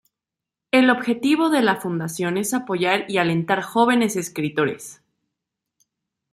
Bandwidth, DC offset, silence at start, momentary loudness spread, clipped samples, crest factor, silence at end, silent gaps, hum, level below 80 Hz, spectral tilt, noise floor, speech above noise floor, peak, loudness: 15 kHz; under 0.1%; 0.75 s; 7 LU; under 0.1%; 18 dB; 1.4 s; none; none; -66 dBFS; -4.5 dB/octave; -87 dBFS; 66 dB; -4 dBFS; -20 LUFS